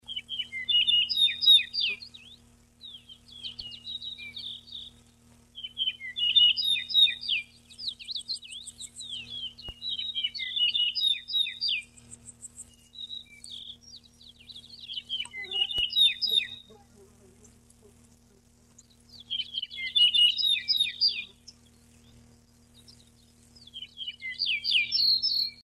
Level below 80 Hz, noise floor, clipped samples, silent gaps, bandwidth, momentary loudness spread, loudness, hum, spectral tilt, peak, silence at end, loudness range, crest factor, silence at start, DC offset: -64 dBFS; -60 dBFS; under 0.1%; none; 15 kHz; 24 LU; -24 LUFS; none; 1 dB/octave; -10 dBFS; 0.25 s; 15 LU; 20 dB; 0.1 s; under 0.1%